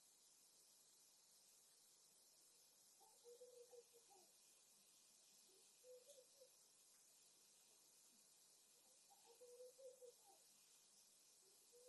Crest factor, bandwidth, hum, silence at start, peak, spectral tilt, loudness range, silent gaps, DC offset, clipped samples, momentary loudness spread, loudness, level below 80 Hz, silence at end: 18 dB; 12 kHz; none; 0 s; -52 dBFS; 0 dB/octave; 2 LU; none; under 0.1%; under 0.1%; 6 LU; -67 LUFS; under -90 dBFS; 0 s